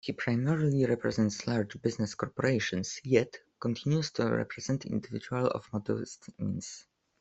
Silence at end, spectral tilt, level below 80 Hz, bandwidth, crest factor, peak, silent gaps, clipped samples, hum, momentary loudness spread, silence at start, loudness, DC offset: 0.4 s; -6 dB/octave; -64 dBFS; 8.2 kHz; 22 dB; -10 dBFS; none; under 0.1%; none; 9 LU; 0.05 s; -32 LUFS; under 0.1%